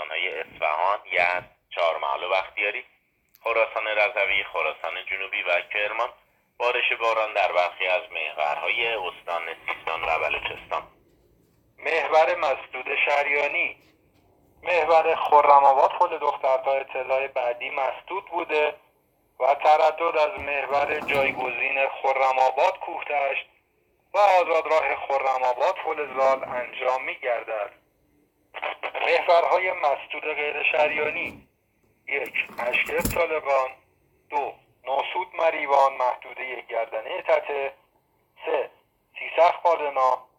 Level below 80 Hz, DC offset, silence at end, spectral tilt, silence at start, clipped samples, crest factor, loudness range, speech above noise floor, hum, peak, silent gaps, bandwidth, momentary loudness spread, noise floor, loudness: -58 dBFS; under 0.1%; 0.15 s; -3 dB/octave; 0 s; under 0.1%; 22 dB; 6 LU; 43 dB; none; -2 dBFS; none; 19.5 kHz; 11 LU; -67 dBFS; -24 LUFS